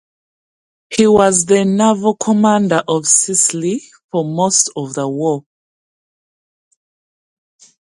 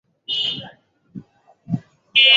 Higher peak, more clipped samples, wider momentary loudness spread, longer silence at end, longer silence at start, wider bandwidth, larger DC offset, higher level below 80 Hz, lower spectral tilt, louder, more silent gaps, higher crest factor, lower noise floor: about the same, 0 dBFS vs -2 dBFS; neither; second, 11 LU vs 24 LU; first, 2.55 s vs 0 s; first, 0.9 s vs 0.3 s; first, 11.5 kHz vs 7.6 kHz; neither; first, -54 dBFS vs -64 dBFS; about the same, -4 dB/octave vs -3.5 dB/octave; first, -14 LUFS vs -21 LUFS; first, 4.04-4.09 s vs none; about the same, 16 dB vs 20 dB; first, under -90 dBFS vs -48 dBFS